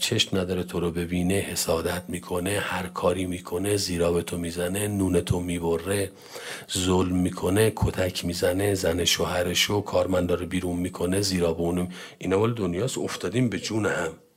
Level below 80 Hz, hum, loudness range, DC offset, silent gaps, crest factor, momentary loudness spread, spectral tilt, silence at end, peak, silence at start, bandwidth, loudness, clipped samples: -50 dBFS; none; 3 LU; under 0.1%; none; 18 dB; 7 LU; -4.5 dB/octave; 0.2 s; -6 dBFS; 0 s; 16 kHz; -26 LUFS; under 0.1%